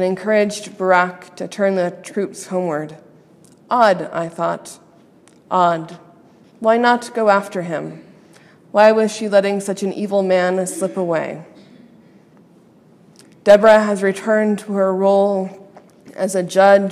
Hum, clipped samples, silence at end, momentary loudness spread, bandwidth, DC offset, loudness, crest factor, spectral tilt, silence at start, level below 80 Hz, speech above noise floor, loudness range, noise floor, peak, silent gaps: none; under 0.1%; 0 s; 14 LU; 13.5 kHz; under 0.1%; -17 LUFS; 18 dB; -5 dB/octave; 0 s; -66 dBFS; 33 dB; 6 LU; -49 dBFS; 0 dBFS; none